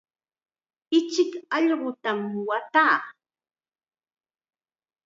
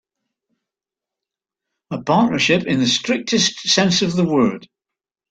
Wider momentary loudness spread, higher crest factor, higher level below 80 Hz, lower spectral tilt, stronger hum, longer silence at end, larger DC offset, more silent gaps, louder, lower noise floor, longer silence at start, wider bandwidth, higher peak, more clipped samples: first, 9 LU vs 6 LU; about the same, 20 dB vs 18 dB; second, -86 dBFS vs -58 dBFS; about the same, -4 dB/octave vs -4 dB/octave; neither; first, 1.95 s vs 0.65 s; neither; neither; second, -24 LUFS vs -17 LUFS; about the same, under -90 dBFS vs -87 dBFS; second, 0.9 s vs 1.9 s; second, 7.8 kHz vs 9.2 kHz; second, -8 dBFS vs -2 dBFS; neither